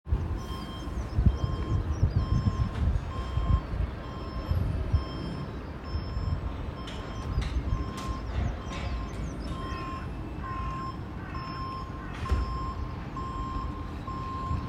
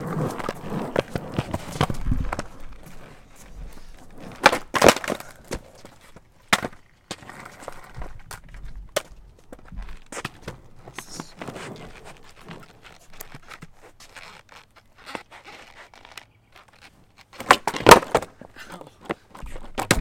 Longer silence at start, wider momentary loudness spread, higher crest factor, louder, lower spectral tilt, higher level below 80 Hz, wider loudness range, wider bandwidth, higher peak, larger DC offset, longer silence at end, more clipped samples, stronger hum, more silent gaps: about the same, 0.05 s vs 0 s; second, 9 LU vs 27 LU; about the same, 22 dB vs 26 dB; second, -33 LUFS vs -22 LUFS; first, -7 dB/octave vs -3.5 dB/octave; first, -34 dBFS vs -42 dBFS; second, 6 LU vs 22 LU; second, 10 kHz vs 17 kHz; second, -10 dBFS vs 0 dBFS; neither; about the same, 0 s vs 0 s; neither; neither; neither